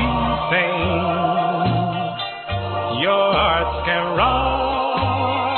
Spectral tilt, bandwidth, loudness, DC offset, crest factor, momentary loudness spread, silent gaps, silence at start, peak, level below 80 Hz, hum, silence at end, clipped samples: -10.5 dB/octave; 4.4 kHz; -19 LUFS; under 0.1%; 14 dB; 7 LU; none; 0 s; -4 dBFS; -34 dBFS; none; 0 s; under 0.1%